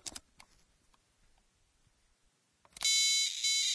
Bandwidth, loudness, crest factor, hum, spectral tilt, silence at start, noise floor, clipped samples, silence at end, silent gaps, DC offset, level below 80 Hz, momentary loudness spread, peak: 11 kHz; -28 LUFS; 20 dB; none; 4 dB/octave; 0.05 s; -74 dBFS; under 0.1%; 0 s; none; under 0.1%; -72 dBFS; 20 LU; -18 dBFS